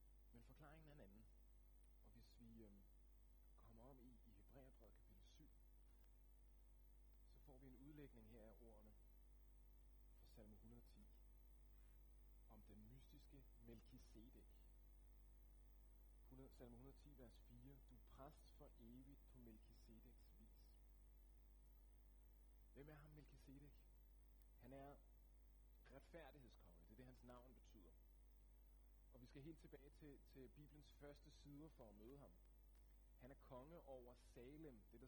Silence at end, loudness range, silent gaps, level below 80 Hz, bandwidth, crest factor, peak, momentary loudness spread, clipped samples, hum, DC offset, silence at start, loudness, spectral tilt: 0 s; 4 LU; none; -70 dBFS; 18 kHz; 18 dB; -48 dBFS; 6 LU; under 0.1%; 50 Hz at -70 dBFS; under 0.1%; 0 s; -67 LUFS; -6.5 dB/octave